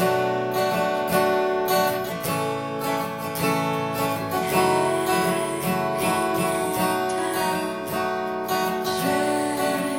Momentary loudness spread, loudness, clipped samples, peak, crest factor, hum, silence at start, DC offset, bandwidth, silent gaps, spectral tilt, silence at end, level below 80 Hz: 5 LU; -23 LUFS; under 0.1%; -8 dBFS; 16 dB; none; 0 s; under 0.1%; 17 kHz; none; -4.5 dB/octave; 0 s; -58 dBFS